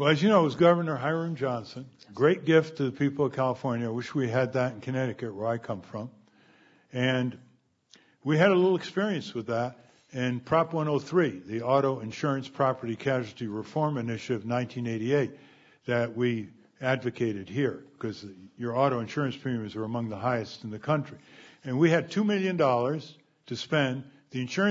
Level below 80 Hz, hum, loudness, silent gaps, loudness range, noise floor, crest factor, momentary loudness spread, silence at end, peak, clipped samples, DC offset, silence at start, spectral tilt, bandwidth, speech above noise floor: -70 dBFS; none; -28 LUFS; none; 4 LU; -61 dBFS; 20 dB; 14 LU; 0 s; -8 dBFS; under 0.1%; under 0.1%; 0 s; -7 dB/octave; 7.8 kHz; 34 dB